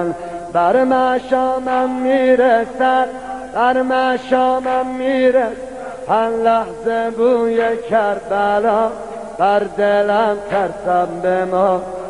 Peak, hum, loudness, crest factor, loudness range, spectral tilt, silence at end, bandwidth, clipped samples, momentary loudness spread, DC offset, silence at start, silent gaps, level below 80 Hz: -2 dBFS; none; -16 LUFS; 14 dB; 2 LU; -6 dB/octave; 0 s; 11 kHz; under 0.1%; 7 LU; 0.3%; 0 s; none; -50 dBFS